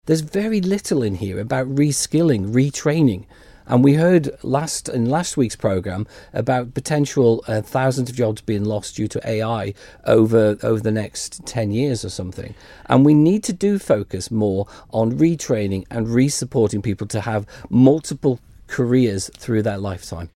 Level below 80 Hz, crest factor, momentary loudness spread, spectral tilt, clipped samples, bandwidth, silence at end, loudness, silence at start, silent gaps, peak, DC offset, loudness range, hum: -48 dBFS; 18 dB; 11 LU; -6 dB/octave; under 0.1%; 15.5 kHz; 0.1 s; -19 LUFS; 0.05 s; none; 0 dBFS; under 0.1%; 3 LU; none